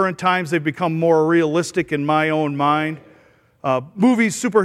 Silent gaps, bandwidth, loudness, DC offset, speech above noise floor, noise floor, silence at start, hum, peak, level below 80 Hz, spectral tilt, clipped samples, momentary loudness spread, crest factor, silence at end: none; 14 kHz; -19 LUFS; under 0.1%; 36 dB; -54 dBFS; 0 s; none; -4 dBFS; -62 dBFS; -5.5 dB/octave; under 0.1%; 6 LU; 16 dB; 0 s